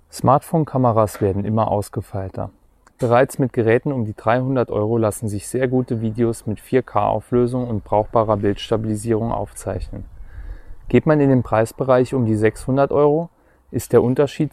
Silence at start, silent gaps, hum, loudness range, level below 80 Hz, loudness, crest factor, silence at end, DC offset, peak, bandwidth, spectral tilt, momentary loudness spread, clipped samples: 0.15 s; none; none; 3 LU; -42 dBFS; -19 LUFS; 16 dB; 0.05 s; under 0.1%; -2 dBFS; 15 kHz; -7.5 dB/octave; 12 LU; under 0.1%